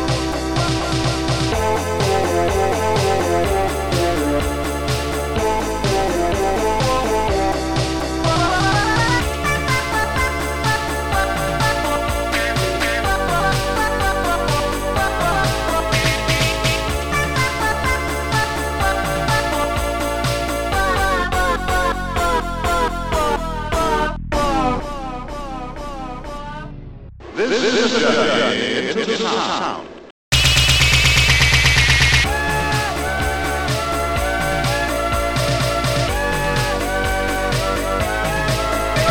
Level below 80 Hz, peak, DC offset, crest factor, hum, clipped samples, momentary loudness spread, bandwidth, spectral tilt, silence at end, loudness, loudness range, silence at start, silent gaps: -28 dBFS; -2 dBFS; 1%; 18 dB; none; under 0.1%; 6 LU; 19 kHz; -4 dB/octave; 0 s; -18 LUFS; 6 LU; 0 s; 30.11-30.32 s